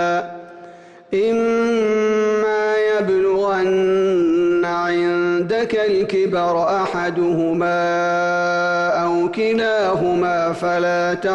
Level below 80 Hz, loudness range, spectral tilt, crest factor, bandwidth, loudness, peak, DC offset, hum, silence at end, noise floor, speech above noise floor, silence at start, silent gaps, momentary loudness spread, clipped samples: -56 dBFS; 1 LU; -6 dB/octave; 8 dB; 9 kHz; -18 LUFS; -10 dBFS; under 0.1%; none; 0 s; -41 dBFS; 23 dB; 0 s; none; 3 LU; under 0.1%